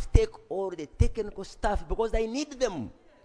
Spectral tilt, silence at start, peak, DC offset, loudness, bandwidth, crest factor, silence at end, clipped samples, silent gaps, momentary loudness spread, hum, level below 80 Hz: -6 dB/octave; 0 s; -6 dBFS; under 0.1%; -31 LUFS; 10.5 kHz; 22 dB; 0.3 s; under 0.1%; none; 9 LU; none; -32 dBFS